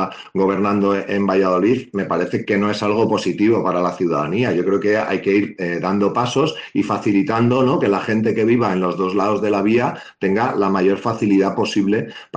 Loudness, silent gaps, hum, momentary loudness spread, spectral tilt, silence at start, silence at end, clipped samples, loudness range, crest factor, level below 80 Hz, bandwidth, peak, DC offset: -18 LUFS; none; none; 4 LU; -6.5 dB/octave; 0 s; 0 s; under 0.1%; 1 LU; 12 dB; -58 dBFS; 9 kHz; -6 dBFS; under 0.1%